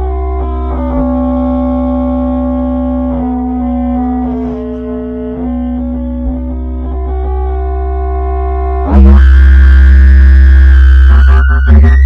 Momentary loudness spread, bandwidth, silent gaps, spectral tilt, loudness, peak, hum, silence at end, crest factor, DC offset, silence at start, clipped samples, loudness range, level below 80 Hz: 13 LU; 3.6 kHz; none; -10 dB/octave; -10 LUFS; 0 dBFS; none; 0 s; 8 dB; under 0.1%; 0 s; 4%; 11 LU; -8 dBFS